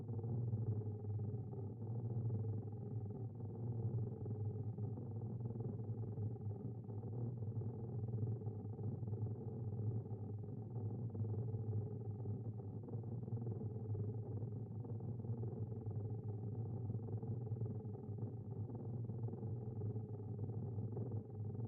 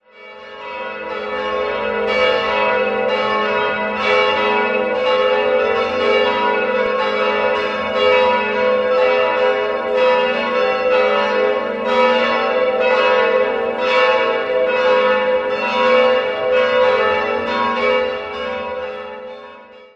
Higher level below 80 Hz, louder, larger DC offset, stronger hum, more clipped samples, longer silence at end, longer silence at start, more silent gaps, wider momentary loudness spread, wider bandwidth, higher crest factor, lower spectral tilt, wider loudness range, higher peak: second, -70 dBFS vs -52 dBFS; second, -46 LUFS vs -16 LUFS; neither; neither; neither; about the same, 0 s vs 0.1 s; second, 0 s vs 0.15 s; neither; second, 5 LU vs 10 LU; second, 1.6 kHz vs 7.2 kHz; about the same, 12 dB vs 16 dB; first, -14 dB/octave vs -4.5 dB/octave; about the same, 1 LU vs 3 LU; second, -32 dBFS vs -2 dBFS